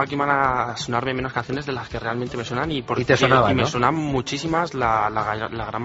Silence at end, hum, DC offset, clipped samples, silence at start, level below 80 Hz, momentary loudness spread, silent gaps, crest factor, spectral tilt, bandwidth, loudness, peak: 0 s; none; under 0.1%; under 0.1%; 0 s; -44 dBFS; 10 LU; none; 20 dB; -4 dB/octave; 8 kHz; -22 LUFS; -2 dBFS